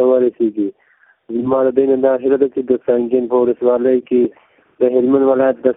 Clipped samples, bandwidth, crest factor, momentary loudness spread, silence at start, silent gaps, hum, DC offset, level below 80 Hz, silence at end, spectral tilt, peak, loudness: under 0.1%; 3.8 kHz; 14 dB; 6 LU; 0 s; none; none; under 0.1%; -58 dBFS; 0.05 s; -12 dB/octave; 0 dBFS; -15 LUFS